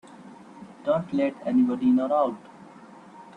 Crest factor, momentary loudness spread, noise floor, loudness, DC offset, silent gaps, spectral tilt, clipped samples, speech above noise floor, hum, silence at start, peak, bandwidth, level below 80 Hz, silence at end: 14 dB; 24 LU; -48 dBFS; -24 LUFS; under 0.1%; none; -8 dB/octave; under 0.1%; 24 dB; none; 0.2 s; -12 dBFS; 8.4 kHz; -68 dBFS; 0.15 s